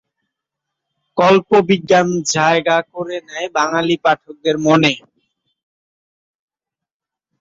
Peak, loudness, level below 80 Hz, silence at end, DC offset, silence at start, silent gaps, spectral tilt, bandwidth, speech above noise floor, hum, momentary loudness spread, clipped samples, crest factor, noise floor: 0 dBFS; -15 LUFS; -60 dBFS; 2.45 s; under 0.1%; 1.15 s; none; -4.5 dB/octave; 7.8 kHz; 71 dB; none; 12 LU; under 0.1%; 16 dB; -86 dBFS